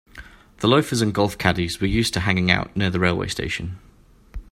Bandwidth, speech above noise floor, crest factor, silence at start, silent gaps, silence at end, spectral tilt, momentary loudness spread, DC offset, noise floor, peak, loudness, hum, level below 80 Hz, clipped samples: 16 kHz; 23 dB; 22 dB; 0.15 s; none; 0.1 s; -5 dB/octave; 13 LU; under 0.1%; -44 dBFS; 0 dBFS; -21 LUFS; none; -40 dBFS; under 0.1%